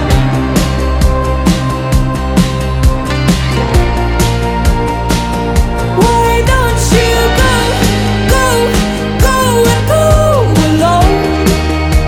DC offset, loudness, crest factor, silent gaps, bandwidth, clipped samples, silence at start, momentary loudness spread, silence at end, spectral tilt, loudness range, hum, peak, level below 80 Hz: under 0.1%; -11 LUFS; 10 dB; none; 17.5 kHz; under 0.1%; 0 s; 4 LU; 0 s; -5.5 dB/octave; 3 LU; none; 0 dBFS; -16 dBFS